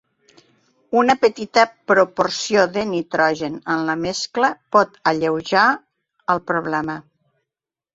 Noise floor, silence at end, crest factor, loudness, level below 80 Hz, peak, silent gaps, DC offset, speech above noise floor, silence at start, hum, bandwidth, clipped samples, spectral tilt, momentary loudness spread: -88 dBFS; 0.95 s; 18 dB; -19 LUFS; -60 dBFS; -2 dBFS; none; under 0.1%; 69 dB; 0.9 s; none; 8 kHz; under 0.1%; -4 dB/octave; 7 LU